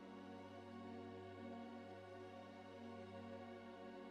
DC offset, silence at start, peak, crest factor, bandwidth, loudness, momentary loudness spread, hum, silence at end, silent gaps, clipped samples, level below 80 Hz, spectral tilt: under 0.1%; 0 s; -42 dBFS; 12 dB; 11.5 kHz; -56 LUFS; 2 LU; 50 Hz at -85 dBFS; 0 s; none; under 0.1%; -90 dBFS; -6.5 dB/octave